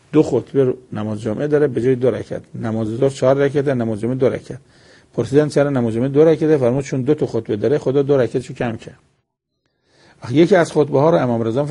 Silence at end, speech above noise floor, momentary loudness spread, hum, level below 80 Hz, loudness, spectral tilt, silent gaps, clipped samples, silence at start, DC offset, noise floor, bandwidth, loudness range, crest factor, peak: 0 s; 55 dB; 12 LU; none; -52 dBFS; -17 LUFS; -7.5 dB/octave; none; under 0.1%; 0.1 s; under 0.1%; -72 dBFS; 11 kHz; 3 LU; 16 dB; 0 dBFS